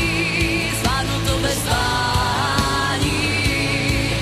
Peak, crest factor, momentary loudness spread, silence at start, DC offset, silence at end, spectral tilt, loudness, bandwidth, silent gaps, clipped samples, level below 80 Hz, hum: -6 dBFS; 12 dB; 1 LU; 0 s; under 0.1%; 0 s; -4 dB/octave; -19 LUFS; 14.5 kHz; none; under 0.1%; -30 dBFS; none